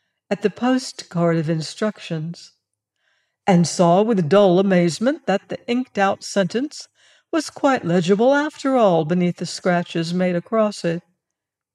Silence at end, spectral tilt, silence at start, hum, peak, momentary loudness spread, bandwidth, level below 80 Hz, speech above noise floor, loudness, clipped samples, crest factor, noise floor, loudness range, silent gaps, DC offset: 0.75 s; -6 dB/octave; 0.3 s; none; -4 dBFS; 10 LU; 11 kHz; -70 dBFS; 64 dB; -20 LUFS; under 0.1%; 16 dB; -83 dBFS; 4 LU; none; under 0.1%